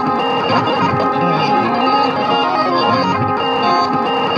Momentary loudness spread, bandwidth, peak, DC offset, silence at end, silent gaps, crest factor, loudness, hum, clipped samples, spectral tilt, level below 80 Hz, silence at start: 2 LU; 9 kHz; 0 dBFS; under 0.1%; 0 s; none; 14 dB; -15 LUFS; none; under 0.1%; -6 dB/octave; -54 dBFS; 0 s